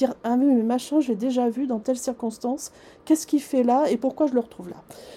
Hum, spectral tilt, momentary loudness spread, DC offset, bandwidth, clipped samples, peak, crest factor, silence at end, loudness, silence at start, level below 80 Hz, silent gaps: none; -5 dB/octave; 14 LU; under 0.1%; 15 kHz; under 0.1%; -8 dBFS; 16 dB; 0 s; -23 LUFS; 0 s; -66 dBFS; none